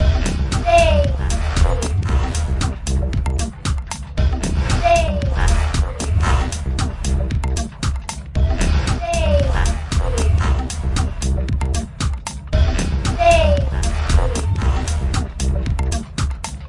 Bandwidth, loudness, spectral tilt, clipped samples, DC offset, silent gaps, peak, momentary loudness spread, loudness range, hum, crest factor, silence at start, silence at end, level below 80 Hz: 11.5 kHz; -19 LUFS; -5.5 dB/octave; under 0.1%; under 0.1%; none; -2 dBFS; 8 LU; 3 LU; none; 16 dB; 0 s; 0 s; -20 dBFS